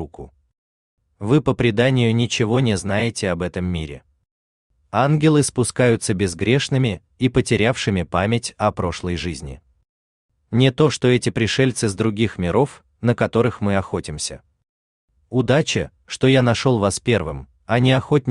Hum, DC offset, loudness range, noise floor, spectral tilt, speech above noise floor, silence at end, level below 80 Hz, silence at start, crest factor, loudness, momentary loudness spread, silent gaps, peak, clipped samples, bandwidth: none; under 0.1%; 3 LU; -38 dBFS; -5.5 dB/octave; 20 dB; 0 s; -46 dBFS; 0 s; 18 dB; -19 LUFS; 9 LU; 0.58-0.97 s, 4.31-4.70 s, 9.89-10.29 s, 14.69-15.08 s; -2 dBFS; under 0.1%; 11 kHz